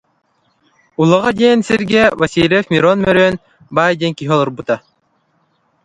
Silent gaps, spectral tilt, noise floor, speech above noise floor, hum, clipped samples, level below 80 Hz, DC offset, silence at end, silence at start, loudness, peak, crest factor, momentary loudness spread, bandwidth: none; -6 dB/octave; -61 dBFS; 48 dB; none; under 0.1%; -48 dBFS; under 0.1%; 1.05 s; 1 s; -13 LUFS; 0 dBFS; 14 dB; 9 LU; 11 kHz